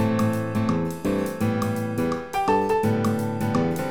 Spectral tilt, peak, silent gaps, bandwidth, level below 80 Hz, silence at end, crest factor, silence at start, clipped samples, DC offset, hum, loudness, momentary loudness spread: -7 dB/octave; -8 dBFS; none; over 20 kHz; -50 dBFS; 0 s; 14 dB; 0 s; under 0.1%; 0.5%; none; -24 LUFS; 4 LU